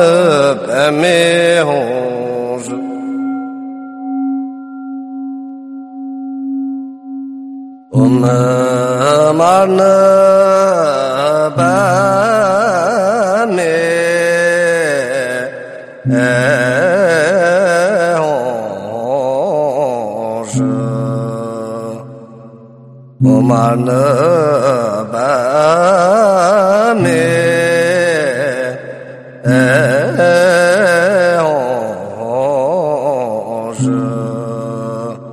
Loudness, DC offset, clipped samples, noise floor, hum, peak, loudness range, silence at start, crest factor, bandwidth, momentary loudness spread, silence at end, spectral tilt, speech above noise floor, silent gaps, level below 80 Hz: -12 LUFS; under 0.1%; under 0.1%; -37 dBFS; none; 0 dBFS; 10 LU; 0 s; 12 dB; 13.5 kHz; 16 LU; 0 s; -5.5 dB/octave; 26 dB; none; -56 dBFS